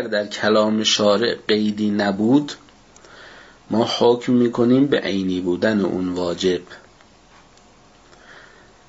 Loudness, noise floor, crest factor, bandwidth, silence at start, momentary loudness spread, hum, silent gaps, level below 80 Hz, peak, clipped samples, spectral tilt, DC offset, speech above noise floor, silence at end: -19 LUFS; -50 dBFS; 16 dB; 8 kHz; 0 s; 7 LU; none; none; -58 dBFS; -4 dBFS; under 0.1%; -5 dB/octave; under 0.1%; 32 dB; 0.5 s